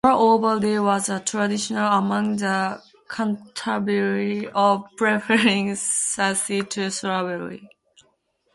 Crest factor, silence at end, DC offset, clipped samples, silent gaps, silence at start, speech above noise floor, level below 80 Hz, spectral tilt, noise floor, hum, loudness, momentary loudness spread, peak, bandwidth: 18 dB; 0.9 s; under 0.1%; under 0.1%; none; 0.05 s; 45 dB; -62 dBFS; -3.5 dB/octave; -66 dBFS; none; -22 LUFS; 10 LU; -4 dBFS; 11.5 kHz